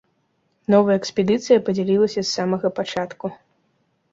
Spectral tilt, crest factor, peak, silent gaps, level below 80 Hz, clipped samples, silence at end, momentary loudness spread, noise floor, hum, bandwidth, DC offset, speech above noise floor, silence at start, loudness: -5.5 dB/octave; 18 dB; -2 dBFS; none; -62 dBFS; under 0.1%; 0.8 s; 13 LU; -68 dBFS; none; 7.8 kHz; under 0.1%; 48 dB; 0.7 s; -20 LUFS